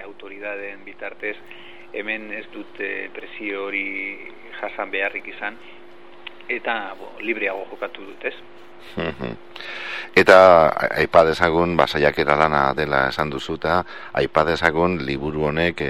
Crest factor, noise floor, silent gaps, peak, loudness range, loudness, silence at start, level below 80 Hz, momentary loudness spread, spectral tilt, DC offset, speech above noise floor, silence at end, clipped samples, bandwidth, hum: 22 dB; -42 dBFS; none; 0 dBFS; 13 LU; -20 LUFS; 0 s; -48 dBFS; 19 LU; -5.5 dB/octave; 0.9%; 21 dB; 0 s; under 0.1%; 13.5 kHz; none